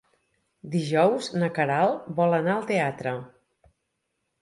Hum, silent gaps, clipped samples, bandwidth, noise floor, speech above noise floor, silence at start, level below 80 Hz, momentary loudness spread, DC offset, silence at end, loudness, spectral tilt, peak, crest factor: none; none; under 0.1%; 11.5 kHz; -78 dBFS; 54 dB; 0.65 s; -70 dBFS; 9 LU; under 0.1%; 1.15 s; -25 LUFS; -6.5 dB/octave; -8 dBFS; 18 dB